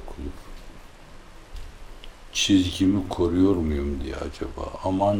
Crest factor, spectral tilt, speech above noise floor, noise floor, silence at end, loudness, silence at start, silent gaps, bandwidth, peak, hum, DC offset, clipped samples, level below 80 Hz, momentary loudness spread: 18 dB; -5 dB/octave; 21 dB; -44 dBFS; 0 s; -24 LUFS; 0 s; none; 17 kHz; -8 dBFS; none; under 0.1%; under 0.1%; -38 dBFS; 25 LU